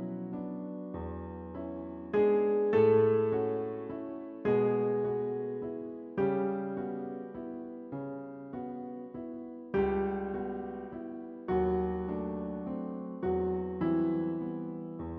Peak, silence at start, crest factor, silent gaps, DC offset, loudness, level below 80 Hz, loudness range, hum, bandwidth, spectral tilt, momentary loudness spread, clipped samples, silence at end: -16 dBFS; 0 s; 18 dB; none; under 0.1%; -33 LUFS; -56 dBFS; 8 LU; none; 4.3 kHz; -8 dB/octave; 14 LU; under 0.1%; 0 s